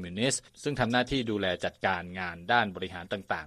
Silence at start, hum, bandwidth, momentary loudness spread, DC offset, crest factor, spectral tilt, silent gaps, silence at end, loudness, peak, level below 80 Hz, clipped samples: 0 s; none; 13.5 kHz; 10 LU; under 0.1%; 22 dB; -4 dB/octave; none; 0 s; -30 LUFS; -10 dBFS; -54 dBFS; under 0.1%